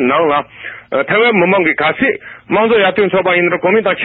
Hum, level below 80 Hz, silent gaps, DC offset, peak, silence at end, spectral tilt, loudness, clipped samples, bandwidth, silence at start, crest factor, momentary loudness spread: none; -54 dBFS; none; under 0.1%; -2 dBFS; 0 s; -10 dB/octave; -12 LUFS; under 0.1%; 4.5 kHz; 0 s; 12 dB; 8 LU